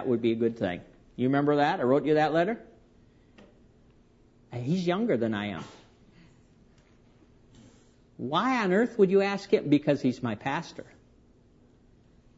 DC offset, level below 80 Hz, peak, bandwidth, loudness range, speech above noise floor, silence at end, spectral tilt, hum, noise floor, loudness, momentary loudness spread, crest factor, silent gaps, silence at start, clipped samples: under 0.1%; -64 dBFS; -10 dBFS; 8 kHz; 7 LU; 34 dB; 1.55 s; -7 dB/octave; none; -60 dBFS; -27 LUFS; 16 LU; 20 dB; none; 0 s; under 0.1%